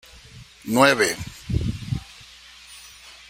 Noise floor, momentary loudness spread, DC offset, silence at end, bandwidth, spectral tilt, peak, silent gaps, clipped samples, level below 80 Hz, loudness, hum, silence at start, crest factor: -46 dBFS; 26 LU; under 0.1%; 0.2 s; 16 kHz; -4.5 dB/octave; 0 dBFS; none; under 0.1%; -42 dBFS; -22 LUFS; none; 0.35 s; 24 dB